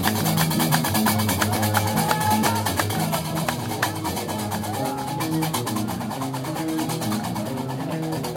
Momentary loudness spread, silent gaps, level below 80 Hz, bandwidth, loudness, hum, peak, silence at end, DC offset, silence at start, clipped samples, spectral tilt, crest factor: 7 LU; none; -54 dBFS; 17 kHz; -24 LUFS; none; -2 dBFS; 0 s; under 0.1%; 0 s; under 0.1%; -4.5 dB/octave; 22 dB